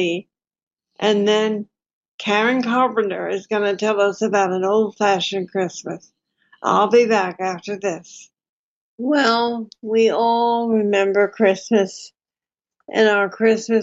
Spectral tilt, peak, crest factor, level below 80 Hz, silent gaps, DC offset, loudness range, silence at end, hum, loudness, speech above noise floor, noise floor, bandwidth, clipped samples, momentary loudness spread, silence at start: -4.5 dB/octave; -2 dBFS; 16 dB; -74 dBFS; 0.63-0.67 s, 1.93-2.01 s, 2.08-2.18 s, 8.49-8.98 s; under 0.1%; 3 LU; 0 s; none; -19 LUFS; over 72 dB; under -90 dBFS; 8 kHz; under 0.1%; 10 LU; 0 s